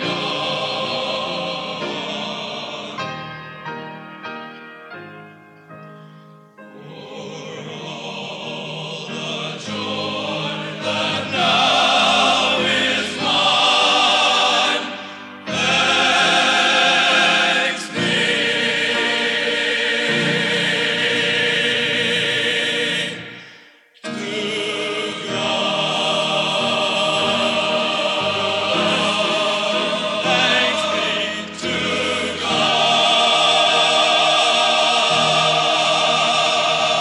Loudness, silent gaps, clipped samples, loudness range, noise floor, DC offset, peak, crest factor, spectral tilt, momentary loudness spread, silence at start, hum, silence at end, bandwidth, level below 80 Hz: -17 LUFS; none; under 0.1%; 17 LU; -48 dBFS; under 0.1%; -4 dBFS; 16 dB; -2.5 dB/octave; 17 LU; 0 s; none; 0 s; 12 kHz; -64 dBFS